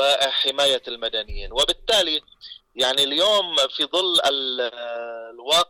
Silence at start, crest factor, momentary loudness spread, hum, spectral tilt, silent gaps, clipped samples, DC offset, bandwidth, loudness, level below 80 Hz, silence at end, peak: 0 s; 12 dB; 14 LU; none; -1 dB/octave; none; under 0.1%; under 0.1%; 18 kHz; -20 LUFS; -44 dBFS; 0.05 s; -10 dBFS